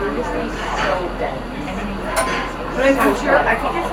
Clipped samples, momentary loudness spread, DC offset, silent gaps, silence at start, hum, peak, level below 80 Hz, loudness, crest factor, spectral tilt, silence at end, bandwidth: under 0.1%; 10 LU; under 0.1%; none; 0 s; none; -2 dBFS; -32 dBFS; -19 LUFS; 16 dB; -4.5 dB/octave; 0 s; 16 kHz